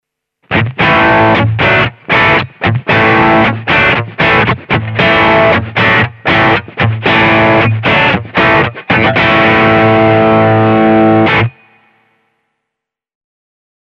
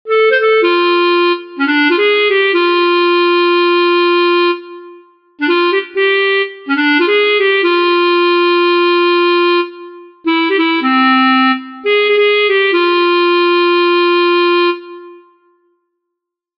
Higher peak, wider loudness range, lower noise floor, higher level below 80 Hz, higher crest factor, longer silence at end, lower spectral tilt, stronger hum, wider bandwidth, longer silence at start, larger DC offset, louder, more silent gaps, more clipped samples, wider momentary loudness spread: about the same, 0 dBFS vs 0 dBFS; about the same, 2 LU vs 2 LU; about the same, -78 dBFS vs -78 dBFS; first, -36 dBFS vs -66 dBFS; about the same, 10 dB vs 12 dB; first, 2.4 s vs 1.4 s; first, -7.5 dB/octave vs -4.5 dB/octave; neither; first, 7 kHz vs 5.6 kHz; first, 0.5 s vs 0.05 s; neither; about the same, -9 LUFS vs -11 LUFS; neither; neither; about the same, 5 LU vs 5 LU